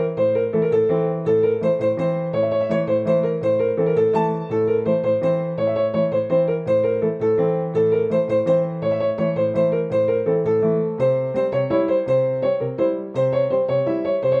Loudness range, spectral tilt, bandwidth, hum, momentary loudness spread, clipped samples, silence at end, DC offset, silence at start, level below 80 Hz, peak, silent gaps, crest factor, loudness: 1 LU; -9.5 dB/octave; 4.8 kHz; none; 3 LU; under 0.1%; 0 s; under 0.1%; 0 s; -60 dBFS; -8 dBFS; none; 12 dB; -20 LUFS